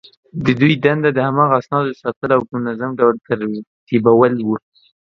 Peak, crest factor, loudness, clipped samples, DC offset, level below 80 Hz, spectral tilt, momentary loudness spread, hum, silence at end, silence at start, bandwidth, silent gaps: 0 dBFS; 16 dB; -16 LUFS; under 0.1%; under 0.1%; -54 dBFS; -8.5 dB/octave; 10 LU; none; 0.5 s; 0.35 s; 7 kHz; 2.16-2.21 s, 3.67-3.87 s